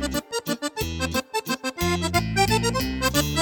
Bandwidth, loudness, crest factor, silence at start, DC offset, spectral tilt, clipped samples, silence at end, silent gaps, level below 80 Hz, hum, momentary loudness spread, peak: 19 kHz; -24 LUFS; 18 dB; 0 s; under 0.1%; -4 dB/octave; under 0.1%; 0 s; none; -38 dBFS; none; 7 LU; -8 dBFS